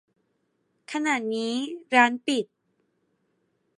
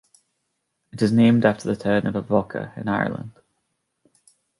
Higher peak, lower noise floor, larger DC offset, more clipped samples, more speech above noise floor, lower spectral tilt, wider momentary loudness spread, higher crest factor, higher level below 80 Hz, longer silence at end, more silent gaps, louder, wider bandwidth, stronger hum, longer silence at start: about the same, -4 dBFS vs -4 dBFS; about the same, -73 dBFS vs -76 dBFS; neither; neither; second, 49 dB vs 55 dB; second, -3 dB/octave vs -7.5 dB/octave; second, 12 LU vs 16 LU; about the same, 24 dB vs 20 dB; second, -84 dBFS vs -56 dBFS; about the same, 1.35 s vs 1.3 s; neither; second, -25 LUFS vs -21 LUFS; about the same, 11.5 kHz vs 11.5 kHz; neither; about the same, 0.9 s vs 0.95 s